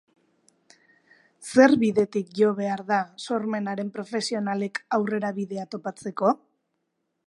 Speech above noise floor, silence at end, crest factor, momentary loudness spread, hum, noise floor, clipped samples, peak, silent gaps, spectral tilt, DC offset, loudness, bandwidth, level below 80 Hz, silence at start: 53 dB; 0.9 s; 22 dB; 14 LU; none; -77 dBFS; under 0.1%; -4 dBFS; none; -5.5 dB/octave; under 0.1%; -25 LUFS; 11.5 kHz; -74 dBFS; 1.4 s